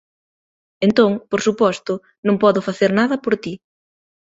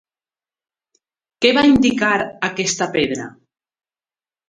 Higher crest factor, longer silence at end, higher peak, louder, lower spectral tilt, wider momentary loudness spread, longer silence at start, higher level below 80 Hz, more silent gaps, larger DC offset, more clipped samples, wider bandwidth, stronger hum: about the same, 18 dB vs 20 dB; second, 0.75 s vs 1.15 s; about the same, -2 dBFS vs 0 dBFS; about the same, -18 LUFS vs -17 LUFS; first, -6 dB/octave vs -3.5 dB/octave; about the same, 10 LU vs 10 LU; second, 0.8 s vs 1.4 s; second, -60 dBFS vs -48 dBFS; first, 2.18-2.23 s vs none; neither; neither; second, 8 kHz vs 9.6 kHz; neither